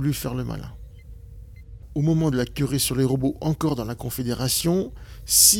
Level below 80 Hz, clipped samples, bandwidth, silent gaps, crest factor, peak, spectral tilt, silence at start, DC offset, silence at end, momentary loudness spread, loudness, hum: -42 dBFS; under 0.1%; 18 kHz; none; 22 dB; 0 dBFS; -4 dB/octave; 0 s; under 0.1%; 0 s; 14 LU; -23 LUFS; none